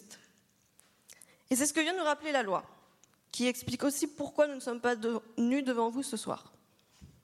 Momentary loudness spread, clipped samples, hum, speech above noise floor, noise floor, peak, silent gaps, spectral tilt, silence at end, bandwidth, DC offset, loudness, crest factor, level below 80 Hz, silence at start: 7 LU; under 0.1%; none; 37 dB; -69 dBFS; -16 dBFS; none; -3 dB/octave; 0.15 s; 15.5 kHz; under 0.1%; -32 LUFS; 18 dB; -72 dBFS; 0.1 s